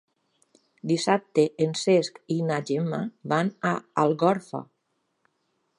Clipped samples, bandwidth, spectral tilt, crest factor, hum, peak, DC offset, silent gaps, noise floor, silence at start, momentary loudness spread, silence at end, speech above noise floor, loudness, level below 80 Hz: under 0.1%; 11.5 kHz; -5.5 dB/octave; 20 dB; none; -6 dBFS; under 0.1%; none; -75 dBFS; 0.85 s; 8 LU; 1.15 s; 50 dB; -25 LUFS; -76 dBFS